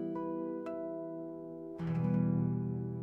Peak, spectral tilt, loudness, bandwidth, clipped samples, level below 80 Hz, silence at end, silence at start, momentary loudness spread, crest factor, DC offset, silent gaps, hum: -22 dBFS; -11.5 dB/octave; -37 LUFS; 3.4 kHz; under 0.1%; -68 dBFS; 0 s; 0 s; 12 LU; 14 dB; under 0.1%; none; none